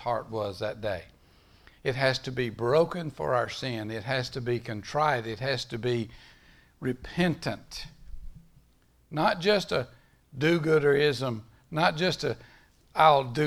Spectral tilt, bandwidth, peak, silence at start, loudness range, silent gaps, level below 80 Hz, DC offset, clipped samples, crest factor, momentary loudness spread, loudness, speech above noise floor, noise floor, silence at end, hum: -5.5 dB/octave; 15.5 kHz; -6 dBFS; 0 s; 6 LU; none; -54 dBFS; under 0.1%; under 0.1%; 22 dB; 13 LU; -28 LUFS; 36 dB; -63 dBFS; 0 s; none